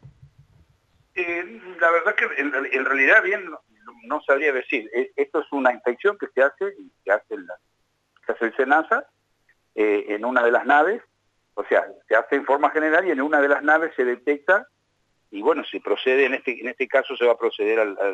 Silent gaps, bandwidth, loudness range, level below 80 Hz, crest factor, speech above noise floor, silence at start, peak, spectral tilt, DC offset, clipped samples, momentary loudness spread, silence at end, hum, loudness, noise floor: none; 8 kHz; 4 LU; -72 dBFS; 18 dB; 48 dB; 0.05 s; -4 dBFS; -4.5 dB/octave; under 0.1%; under 0.1%; 12 LU; 0 s; none; -21 LUFS; -69 dBFS